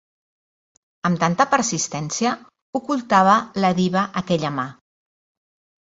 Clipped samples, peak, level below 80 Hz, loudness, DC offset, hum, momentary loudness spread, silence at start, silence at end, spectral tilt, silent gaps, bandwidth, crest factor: under 0.1%; -2 dBFS; -60 dBFS; -20 LUFS; under 0.1%; none; 12 LU; 1.05 s; 1.1 s; -4.5 dB/octave; 2.62-2.73 s; 8 kHz; 20 dB